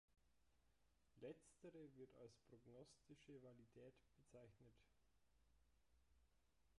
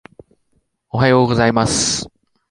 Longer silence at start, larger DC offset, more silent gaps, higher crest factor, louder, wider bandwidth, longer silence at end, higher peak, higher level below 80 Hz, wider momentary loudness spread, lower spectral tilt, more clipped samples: second, 0.1 s vs 0.95 s; neither; neither; about the same, 20 dB vs 16 dB; second, -66 LUFS vs -15 LUFS; about the same, 11 kHz vs 11.5 kHz; second, 0 s vs 0.45 s; second, -48 dBFS vs -2 dBFS; second, -84 dBFS vs -42 dBFS; second, 8 LU vs 12 LU; first, -6 dB/octave vs -4 dB/octave; neither